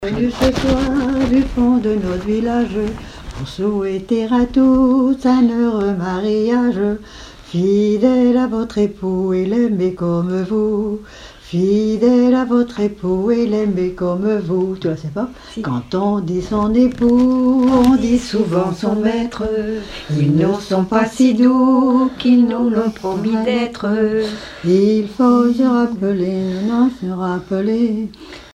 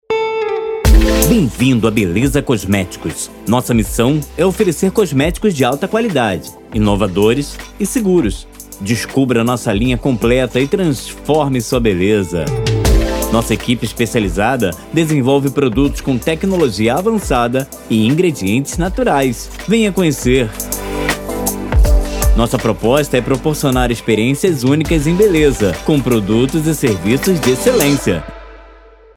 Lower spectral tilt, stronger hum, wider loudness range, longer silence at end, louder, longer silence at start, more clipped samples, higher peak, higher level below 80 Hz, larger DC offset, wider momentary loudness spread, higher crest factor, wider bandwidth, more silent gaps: first, -7.5 dB/octave vs -5.5 dB/octave; neither; about the same, 4 LU vs 2 LU; second, 0.15 s vs 0.45 s; about the same, -16 LUFS vs -15 LUFS; about the same, 0 s vs 0.1 s; neither; about the same, 0 dBFS vs 0 dBFS; second, -38 dBFS vs -22 dBFS; neither; first, 10 LU vs 6 LU; about the same, 16 dB vs 14 dB; second, 9.8 kHz vs 18 kHz; neither